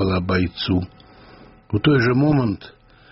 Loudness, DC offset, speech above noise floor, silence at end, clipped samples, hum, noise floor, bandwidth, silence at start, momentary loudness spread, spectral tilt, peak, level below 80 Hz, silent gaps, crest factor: -20 LUFS; under 0.1%; 27 dB; 0.4 s; under 0.1%; none; -46 dBFS; 6 kHz; 0 s; 10 LU; -5.5 dB/octave; -4 dBFS; -44 dBFS; none; 16 dB